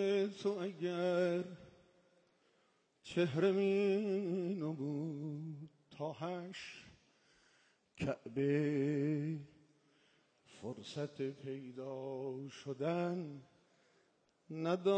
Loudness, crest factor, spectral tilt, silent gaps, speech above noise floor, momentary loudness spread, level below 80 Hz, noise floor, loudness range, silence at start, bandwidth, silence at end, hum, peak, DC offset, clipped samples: -39 LUFS; 18 dB; -7 dB/octave; none; 38 dB; 16 LU; -76 dBFS; -76 dBFS; 9 LU; 0 s; 9.2 kHz; 0 s; none; -22 dBFS; under 0.1%; under 0.1%